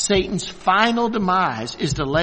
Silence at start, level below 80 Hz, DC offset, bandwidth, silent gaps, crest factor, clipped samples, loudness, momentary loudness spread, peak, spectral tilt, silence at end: 0 s; -42 dBFS; under 0.1%; 8.8 kHz; none; 18 dB; under 0.1%; -20 LUFS; 8 LU; -2 dBFS; -4 dB/octave; 0 s